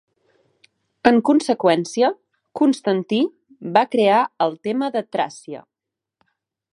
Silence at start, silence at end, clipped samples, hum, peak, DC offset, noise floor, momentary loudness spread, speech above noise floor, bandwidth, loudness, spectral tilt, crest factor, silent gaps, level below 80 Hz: 1.05 s; 1.15 s; under 0.1%; none; 0 dBFS; under 0.1%; -85 dBFS; 19 LU; 67 dB; 11 kHz; -19 LUFS; -5.5 dB/octave; 20 dB; none; -66 dBFS